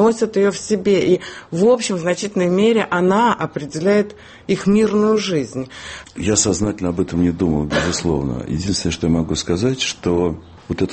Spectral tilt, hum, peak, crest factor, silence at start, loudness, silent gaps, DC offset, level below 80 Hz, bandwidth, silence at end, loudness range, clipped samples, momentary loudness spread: -5 dB/octave; none; -2 dBFS; 16 dB; 0 s; -18 LUFS; none; under 0.1%; -40 dBFS; 8.8 kHz; 0 s; 2 LU; under 0.1%; 9 LU